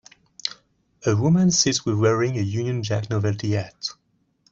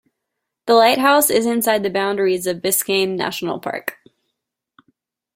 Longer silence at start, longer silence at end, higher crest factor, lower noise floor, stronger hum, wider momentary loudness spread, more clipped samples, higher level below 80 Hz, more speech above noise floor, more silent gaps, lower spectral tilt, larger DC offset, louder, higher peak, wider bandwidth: second, 0.45 s vs 0.65 s; second, 0.6 s vs 1.45 s; about the same, 18 dB vs 18 dB; second, -65 dBFS vs -79 dBFS; neither; about the same, 13 LU vs 12 LU; neither; first, -58 dBFS vs -64 dBFS; second, 44 dB vs 62 dB; neither; first, -5 dB/octave vs -3 dB/octave; neither; second, -22 LUFS vs -17 LUFS; second, -6 dBFS vs -2 dBFS; second, 8 kHz vs 16.5 kHz